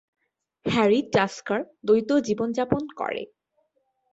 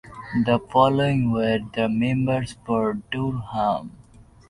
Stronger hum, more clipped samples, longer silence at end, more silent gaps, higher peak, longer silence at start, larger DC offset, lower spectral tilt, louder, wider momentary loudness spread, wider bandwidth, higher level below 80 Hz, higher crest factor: neither; neither; first, 0.85 s vs 0.25 s; neither; about the same, -6 dBFS vs -4 dBFS; first, 0.65 s vs 0.05 s; neither; second, -5.5 dB/octave vs -7.5 dB/octave; about the same, -24 LUFS vs -23 LUFS; about the same, 10 LU vs 8 LU; second, 8 kHz vs 11.5 kHz; second, -58 dBFS vs -50 dBFS; about the same, 20 dB vs 18 dB